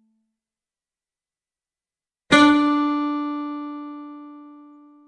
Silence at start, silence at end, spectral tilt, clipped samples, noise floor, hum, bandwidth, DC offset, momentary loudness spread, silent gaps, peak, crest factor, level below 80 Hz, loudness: 2.3 s; 0.5 s; -4 dB/octave; under 0.1%; under -90 dBFS; none; 10 kHz; under 0.1%; 23 LU; none; -2 dBFS; 22 dB; -62 dBFS; -19 LUFS